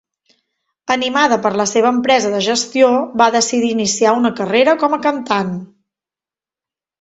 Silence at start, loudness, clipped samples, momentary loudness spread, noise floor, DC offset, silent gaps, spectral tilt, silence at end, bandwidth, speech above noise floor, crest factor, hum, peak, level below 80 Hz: 0.9 s; -15 LUFS; under 0.1%; 6 LU; -90 dBFS; under 0.1%; none; -3 dB/octave; 1.35 s; 8.2 kHz; 75 dB; 16 dB; none; 0 dBFS; -60 dBFS